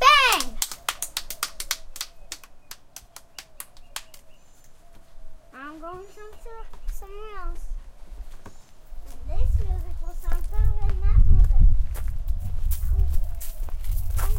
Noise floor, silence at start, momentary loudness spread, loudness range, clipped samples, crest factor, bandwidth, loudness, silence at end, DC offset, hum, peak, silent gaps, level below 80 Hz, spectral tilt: -46 dBFS; 0 s; 23 LU; 17 LU; under 0.1%; 20 dB; 17 kHz; -26 LUFS; 0 s; under 0.1%; none; -2 dBFS; none; -24 dBFS; -3 dB/octave